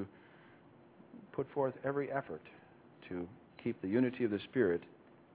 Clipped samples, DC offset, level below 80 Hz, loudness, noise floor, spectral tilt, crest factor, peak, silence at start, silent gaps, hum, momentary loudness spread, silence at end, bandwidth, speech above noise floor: under 0.1%; under 0.1%; -70 dBFS; -37 LUFS; -61 dBFS; -6 dB/octave; 20 dB; -18 dBFS; 0 s; none; none; 23 LU; 0.45 s; 4 kHz; 25 dB